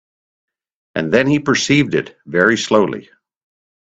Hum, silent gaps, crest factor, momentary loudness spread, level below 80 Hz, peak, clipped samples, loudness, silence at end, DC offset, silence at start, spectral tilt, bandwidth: none; none; 18 dB; 9 LU; -54 dBFS; 0 dBFS; under 0.1%; -16 LUFS; 0.95 s; under 0.1%; 0.95 s; -4.5 dB/octave; 8.4 kHz